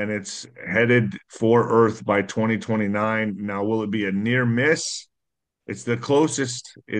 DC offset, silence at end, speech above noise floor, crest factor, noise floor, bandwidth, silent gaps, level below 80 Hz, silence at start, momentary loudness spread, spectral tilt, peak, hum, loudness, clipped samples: under 0.1%; 0 s; 61 dB; 18 dB; -83 dBFS; 10 kHz; none; -64 dBFS; 0 s; 11 LU; -5.5 dB/octave; -6 dBFS; none; -22 LUFS; under 0.1%